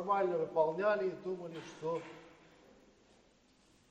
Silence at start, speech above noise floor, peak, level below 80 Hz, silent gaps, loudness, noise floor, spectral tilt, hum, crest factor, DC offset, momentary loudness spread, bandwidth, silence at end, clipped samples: 0 s; 33 dB; -18 dBFS; -78 dBFS; none; -36 LUFS; -68 dBFS; -6.5 dB/octave; none; 20 dB; under 0.1%; 15 LU; 8.8 kHz; 1.6 s; under 0.1%